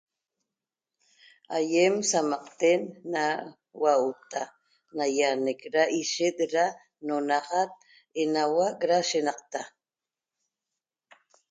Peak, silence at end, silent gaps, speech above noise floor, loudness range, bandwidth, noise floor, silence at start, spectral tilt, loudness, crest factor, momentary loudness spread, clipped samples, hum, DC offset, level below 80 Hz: -10 dBFS; 1.85 s; none; over 64 dB; 3 LU; 9.6 kHz; under -90 dBFS; 1.5 s; -3 dB/octave; -27 LUFS; 18 dB; 12 LU; under 0.1%; none; under 0.1%; -80 dBFS